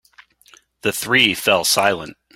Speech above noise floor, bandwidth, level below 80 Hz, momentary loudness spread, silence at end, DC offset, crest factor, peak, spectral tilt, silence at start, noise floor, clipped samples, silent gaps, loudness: 34 dB; 16.5 kHz; -58 dBFS; 10 LU; 0.25 s; under 0.1%; 20 dB; 0 dBFS; -2 dB/octave; 0.85 s; -52 dBFS; under 0.1%; none; -17 LUFS